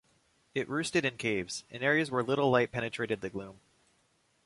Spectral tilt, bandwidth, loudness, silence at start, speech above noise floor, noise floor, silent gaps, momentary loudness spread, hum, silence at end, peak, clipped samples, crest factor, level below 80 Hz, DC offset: -5 dB/octave; 11.5 kHz; -31 LUFS; 0.55 s; 40 dB; -72 dBFS; none; 12 LU; none; 0.9 s; -12 dBFS; under 0.1%; 22 dB; -66 dBFS; under 0.1%